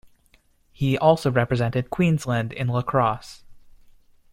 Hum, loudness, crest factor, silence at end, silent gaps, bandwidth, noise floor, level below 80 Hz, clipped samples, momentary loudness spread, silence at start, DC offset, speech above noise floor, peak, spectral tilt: none; -22 LUFS; 20 dB; 0.75 s; none; 15.5 kHz; -60 dBFS; -50 dBFS; under 0.1%; 8 LU; 0.8 s; under 0.1%; 38 dB; -4 dBFS; -7 dB/octave